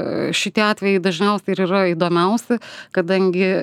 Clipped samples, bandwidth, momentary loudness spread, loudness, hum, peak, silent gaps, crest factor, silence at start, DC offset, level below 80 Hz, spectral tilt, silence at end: under 0.1%; 14 kHz; 6 LU; -19 LUFS; none; -2 dBFS; none; 16 dB; 0 s; under 0.1%; -68 dBFS; -5.5 dB/octave; 0 s